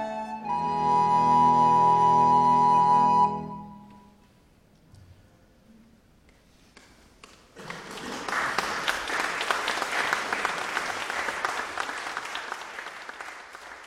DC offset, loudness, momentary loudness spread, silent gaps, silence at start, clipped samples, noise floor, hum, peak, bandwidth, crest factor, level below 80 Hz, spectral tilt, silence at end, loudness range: under 0.1%; -24 LUFS; 19 LU; none; 0 s; under 0.1%; -59 dBFS; none; -8 dBFS; 15 kHz; 18 dB; -60 dBFS; -3.5 dB/octave; 0 s; 14 LU